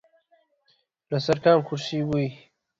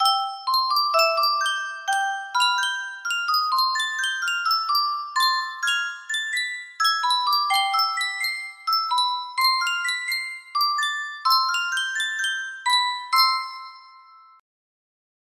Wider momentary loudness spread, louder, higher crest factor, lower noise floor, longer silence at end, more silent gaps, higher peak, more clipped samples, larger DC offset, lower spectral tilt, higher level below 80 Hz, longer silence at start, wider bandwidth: first, 10 LU vs 7 LU; about the same, -24 LUFS vs -22 LUFS; about the same, 20 dB vs 20 dB; first, -68 dBFS vs -50 dBFS; second, 0.45 s vs 1.4 s; neither; about the same, -6 dBFS vs -4 dBFS; neither; neither; first, -6.5 dB/octave vs 4 dB/octave; first, -62 dBFS vs -80 dBFS; first, 1.1 s vs 0 s; second, 7.8 kHz vs 16 kHz